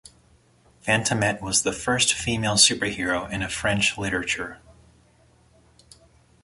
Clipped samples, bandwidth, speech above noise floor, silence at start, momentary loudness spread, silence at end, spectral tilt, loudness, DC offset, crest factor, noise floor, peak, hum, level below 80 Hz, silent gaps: under 0.1%; 12 kHz; 35 dB; 0.85 s; 11 LU; 1.85 s; -2.5 dB/octave; -22 LUFS; under 0.1%; 24 dB; -58 dBFS; -2 dBFS; none; -50 dBFS; none